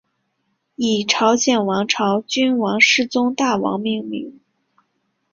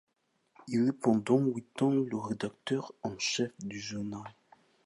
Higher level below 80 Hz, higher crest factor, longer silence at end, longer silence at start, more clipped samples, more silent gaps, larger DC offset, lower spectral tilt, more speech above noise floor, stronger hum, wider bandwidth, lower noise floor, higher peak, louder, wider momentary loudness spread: first, -62 dBFS vs -70 dBFS; about the same, 20 dB vs 18 dB; first, 1 s vs 0.55 s; first, 0.8 s vs 0.6 s; neither; neither; neither; second, -3 dB/octave vs -5.5 dB/octave; first, 52 dB vs 40 dB; neither; second, 7.4 kHz vs 11.5 kHz; about the same, -70 dBFS vs -71 dBFS; first, 0 dBFS vs -14 dBFS; first, -17 LUFS vs -32 LUFS; about the same, 11 LU vs 12 LU